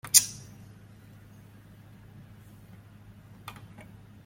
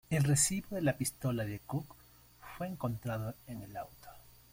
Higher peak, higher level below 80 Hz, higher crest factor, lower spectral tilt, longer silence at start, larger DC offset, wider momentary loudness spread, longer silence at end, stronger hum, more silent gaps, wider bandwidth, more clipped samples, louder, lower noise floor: first, 0 dBFS vs -16 dBFS; about the same, -64 dBFS vs -60 dBFS; first, 34 dB vs 20 dB; second, 0 dB/octave vs -4.5 dB/octave; about the same, 0.05 s vs 0.1 s; neither; second, 17 LU vs 23 LU; first, 0.45 s vs 0.2 s; neither; neither; about the same, 16.5 kHz vs 16.5 kHz; neither; first, -22 LUFS vs -35 LUFS; second, -52 dBFS vs -57 dBFS